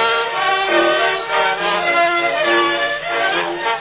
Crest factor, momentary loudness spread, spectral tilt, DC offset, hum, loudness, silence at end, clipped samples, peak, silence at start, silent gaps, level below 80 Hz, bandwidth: 14 dB; 4 LU; -6.5 dB/octave; under 0.1%; none; -16 LUFS; 0 s; under 0.1%; -4 dBFS; 0 s; none; -56 dBFS; 4 kHz